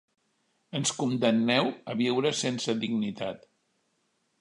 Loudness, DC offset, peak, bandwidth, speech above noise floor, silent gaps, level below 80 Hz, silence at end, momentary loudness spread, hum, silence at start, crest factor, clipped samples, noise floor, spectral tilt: -28 LUFS; under 0.1%; -10 dBFS; 11 kHz; 46 dB; none; -74 dBFS; 1.05 s; 12 LU; none; 0.75 s; 20 dB; under 0.1%; -74 dBFS; -4 dB/octave